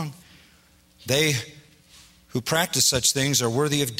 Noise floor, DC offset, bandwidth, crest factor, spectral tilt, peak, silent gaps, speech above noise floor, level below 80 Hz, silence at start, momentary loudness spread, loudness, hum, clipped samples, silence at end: -57 dBFS; under 0.1%; 16 kHz; 18 dB; -3 dB/octave; -6 dBFS; none; 34 dB; -54 dBFS; 0 s; 16 LU; -22 LUFS; none; under 0.1%; 0 s